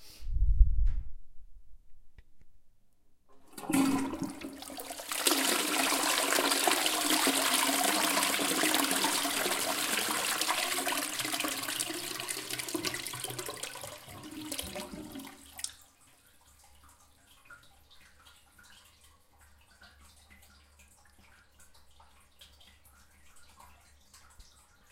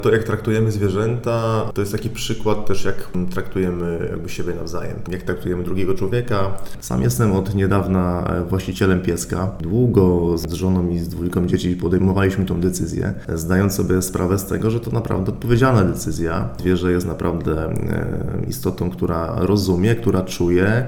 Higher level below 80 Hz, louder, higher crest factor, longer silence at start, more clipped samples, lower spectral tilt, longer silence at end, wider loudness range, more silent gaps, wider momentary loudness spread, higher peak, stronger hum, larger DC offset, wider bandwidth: about the same, -40 dBFS vs -36 dBFS; second, -30 LUFS vs -20 LUFS; first, 26 dB vs 18 dB; about the same, 0 s vs 0 s; neither; second, -2 dB/octave vs -6.5 dB/octave; first, 0.5 s vs 0 s; first, 17 LU vs 5 LU; neither; first, 17 LU vs 8 LU; second, -8 dBFS vs -2 dBFS; neither; neither; second, 17 kHz vs 19 kHz